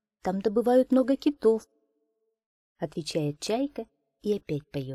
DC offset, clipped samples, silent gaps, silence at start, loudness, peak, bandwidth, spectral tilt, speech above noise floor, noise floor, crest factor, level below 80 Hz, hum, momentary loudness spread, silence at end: under 0.1%; under 0.1%; 2.46-2.75 s; 0.25 s; -27 LUFS; -12 dBFS; 13.5 kHz; -6.5 dB/octave; 50 dB; -77 dBFS; 16 dB; -62 dBFS; none; 13 LU; 0 s